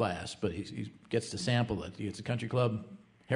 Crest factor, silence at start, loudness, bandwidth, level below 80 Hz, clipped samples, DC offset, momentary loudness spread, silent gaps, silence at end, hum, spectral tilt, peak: 18 dB; 0 s; -35 LUFS; 11 kHz; -62 dBFS; under 0.1%; under 0.1%; 11 LU; none; 0 s; none; -6 dB/octave; -16 dBFS